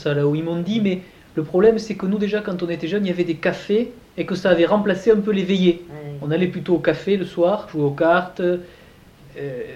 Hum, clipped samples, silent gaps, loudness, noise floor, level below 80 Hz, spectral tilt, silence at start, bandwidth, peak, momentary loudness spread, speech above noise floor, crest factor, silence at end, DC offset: none; under 0.1%; none; -20 LUFS; -47 dBFS; -52 dBFS; -7.5 dB/octave; 0 s; 9 kHz; -4 dBFS; 12 LU; 27 dB; 18 dB; 0 s; under 0.1%